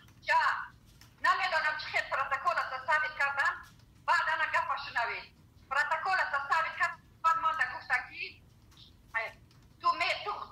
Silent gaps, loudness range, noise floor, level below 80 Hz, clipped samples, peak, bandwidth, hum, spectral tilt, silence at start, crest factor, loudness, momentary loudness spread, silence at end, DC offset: none; 3 LU; -58 dBFS; -66 dBFS; under 0.1%; -16 dBFS; 15.5 kHz; none; -1.5 dB/octave; 0.25 s; 16 dB; -31 LUFS; 9 LU; 0 s; under 0.1%